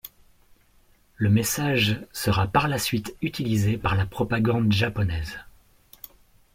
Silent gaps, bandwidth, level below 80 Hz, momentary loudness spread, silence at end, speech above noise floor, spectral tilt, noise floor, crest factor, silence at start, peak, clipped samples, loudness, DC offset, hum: none; 16.5 kHz; -46 dBFS; 20 LU; 1.05 s; 36 dB; -5 dB/octave; -59 dBFS; 18 dB; 0.05 s; -6 dBFS; under 0.1%; -24 LUFS; under 0.1%; none